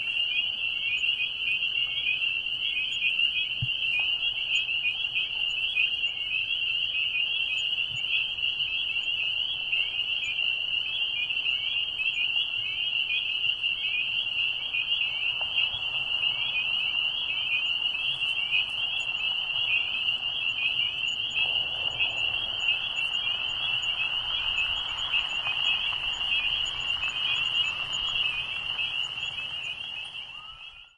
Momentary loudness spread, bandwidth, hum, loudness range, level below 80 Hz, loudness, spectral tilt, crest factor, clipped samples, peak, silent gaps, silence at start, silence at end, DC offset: 3 LU; 11.5 kHz; none; 1 LU; -58 dBFS; -26 LUFS; -0.5 dB/octave; 16 dB; under 0.1%; -12 dBFS; none; 0 s; 0.1 s; under 0.1%